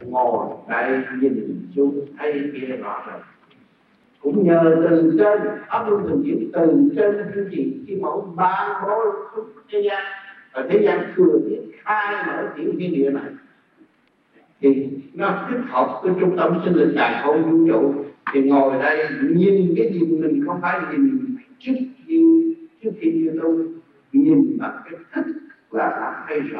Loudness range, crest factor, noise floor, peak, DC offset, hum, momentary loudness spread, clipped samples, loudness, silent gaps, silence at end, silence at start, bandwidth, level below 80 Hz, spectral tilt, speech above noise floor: 6 LU; 16 dB; -61 dBFS; -2 dBFS; under 0.1%; none; 13 LU; under 0.1%; -20 LUFS; none; 0 s; 0 s; 4.8 kHz; -70 dBFS; -10.5 dB/octave; 41 dB